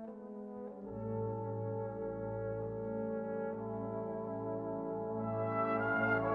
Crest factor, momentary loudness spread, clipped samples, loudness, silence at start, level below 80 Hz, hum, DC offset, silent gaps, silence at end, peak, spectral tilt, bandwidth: 18 dB; 12 LU; under 0.1%; -39 LUFS; 0 s; -64 dBFS; none; under 0.1%; none; 0 s; -20 dBFS; -10.5 dB/octave; 4.8 kHz